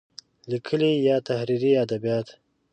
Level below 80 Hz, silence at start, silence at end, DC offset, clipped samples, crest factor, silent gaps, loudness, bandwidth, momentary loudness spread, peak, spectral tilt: -70 dBFS; 0.45 s; 0.4 s; under 0.1%; under 0.1%; 14 dB; none; -24 LUFS; 9 kHz; 11 LU; -10 dBFS; -7 dB/octave